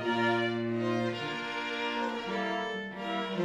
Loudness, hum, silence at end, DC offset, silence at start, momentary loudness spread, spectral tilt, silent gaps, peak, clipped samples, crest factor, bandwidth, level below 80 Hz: -32 LUFS; none; 0 s; under 0.1%; 0 s; 6 LU; -5.5 dB/octave; none; -16 dBFS; under 0.1%; 16 dB; 11 kHz; -68 dBFS